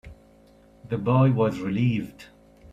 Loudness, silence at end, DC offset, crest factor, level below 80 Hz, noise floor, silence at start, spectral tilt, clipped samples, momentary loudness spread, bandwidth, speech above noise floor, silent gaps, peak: -24 LUFS; 0 s; under 0.1%; 16 dB; -54 dBFS; -54 dBFS; 0.05 s; -9 dB/octave; under 0.1%; 12 LU; 7.6 kHz; 32 dB; none; -10 dBFS